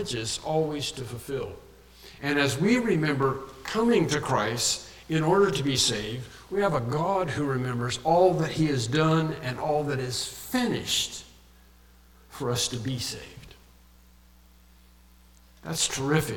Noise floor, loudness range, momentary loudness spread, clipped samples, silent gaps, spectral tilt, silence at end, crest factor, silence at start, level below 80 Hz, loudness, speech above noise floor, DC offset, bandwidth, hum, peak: -55 dBFS; 9 LU; 11 LU; under 0.1%; none; -4.5 dB/octave; 0 s; 20 dB; 0 s; -52 dBFS; -26 LUFS; 29 dB; under 0.1%; 18 kHz; none; -8 dBFS